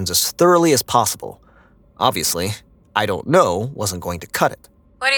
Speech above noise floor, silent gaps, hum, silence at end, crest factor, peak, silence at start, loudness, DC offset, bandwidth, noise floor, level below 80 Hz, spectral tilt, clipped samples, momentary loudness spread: 33 dB; none; none; 0 s; 18 dB; 0 dBFS; 0 s; -18 LUFS; under 0.1%; over 20 kHz; -51 dBFS; -50 dBFS; -3.5 dB/octave; under 0.1%; 12 LU